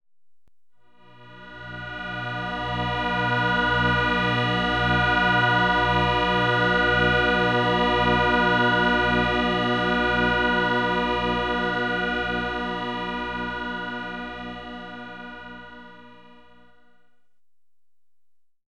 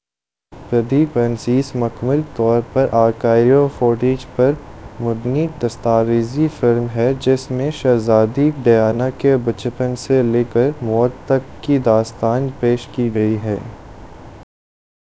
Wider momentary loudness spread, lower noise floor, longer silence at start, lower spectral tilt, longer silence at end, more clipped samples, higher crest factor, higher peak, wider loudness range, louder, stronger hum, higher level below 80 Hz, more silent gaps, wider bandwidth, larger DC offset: first, 17 LU vs 7 LU; about the same, under -90 dBFS vs -88 dBFS; first, 1.2 s vs 0.5 s; second, -6 dB/octave vs -8 dB/octave; first, 2.6 s vs 0.6 s; neither; about the same, 16 dB vs 16 dB; second, -8 dBFS vs 0 dBFS; first, 14 LU vs 2 LU; second, -22 LUFS vs -17 LUFS; neither; about the same, -42 dBFS vs -44 dBFS; neither; first, 9.6 kHz vs 8 kHz; about the same, 0.3% vs 0.4%